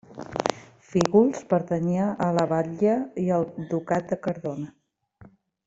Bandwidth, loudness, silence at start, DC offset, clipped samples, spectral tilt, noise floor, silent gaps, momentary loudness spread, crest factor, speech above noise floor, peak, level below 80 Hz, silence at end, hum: 8.2 kHz; -25 LUFS; 0.1 s; under 0.1%; under 0.1%; -7 dB/octave; -54 dBFS; none; 10 LU; 20 dB; 30 dB; -6 dBFS; -62 dBFS; 0.4 s; none